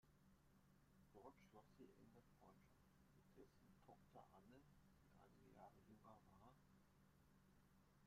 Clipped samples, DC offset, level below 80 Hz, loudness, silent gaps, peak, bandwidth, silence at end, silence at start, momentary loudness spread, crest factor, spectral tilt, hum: under 0.1%; under 0.1%; -82 dBFS; -69 LUFS; none; -50 dBFS; 14.5 kHz; 0 s; 0 s; 2 LU; 20 dB; -6 dB/octave; none